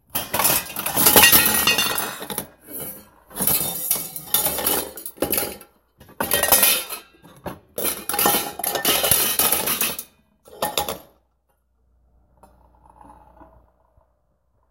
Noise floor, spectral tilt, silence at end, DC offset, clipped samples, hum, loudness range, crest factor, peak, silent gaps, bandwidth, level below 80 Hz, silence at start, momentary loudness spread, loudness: -67 dBFS; -1 dB/octave; 1.25 s; under 0.1%; under 0.1%; none; 12 LU; 24 dB; 0 dBFS; none; 17.5 kHz; -50 dBFS; 0.15 s; 19 LU; -18 LUFS